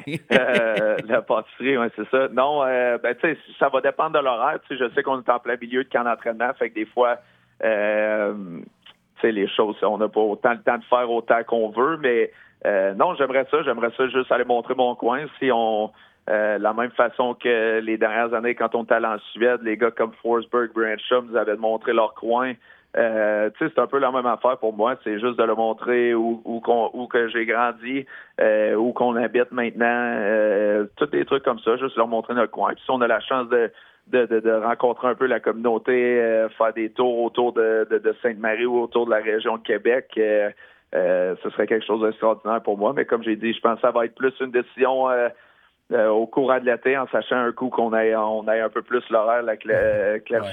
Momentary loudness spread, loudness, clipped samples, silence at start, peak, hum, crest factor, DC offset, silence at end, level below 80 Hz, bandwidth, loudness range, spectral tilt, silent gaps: 4 LU; -22 LUFS; under 0.1%; 0 s; 0 dBFS; none; 22 dB; under 0.1%; 0 s; -66 dBFS; 6.6 kHz; 2 LU; -6.5 dB/octave; none